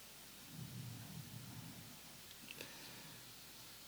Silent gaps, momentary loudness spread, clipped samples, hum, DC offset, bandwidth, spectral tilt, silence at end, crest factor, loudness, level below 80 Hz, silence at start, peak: none; 3 LU; under 0.1%; none; under 0.1%; over 20 kHz; -3.5 dB/octave; 0 s; 22 dB; -52 LUFS; -76 dBFS; 0 s; -32 dBFS